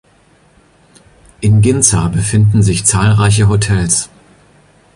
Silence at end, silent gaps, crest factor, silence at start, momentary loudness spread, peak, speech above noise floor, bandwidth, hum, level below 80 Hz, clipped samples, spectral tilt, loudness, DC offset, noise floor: 0.9 s; none; 12 dB; 1.4 s; 4 LU; 0 dBFS; 39 dB; 11.5 kHz; none; -32 dBFS; under 0.1%; -5 dB/octave; -11 LUFS; under 0.1%; -49 dBFS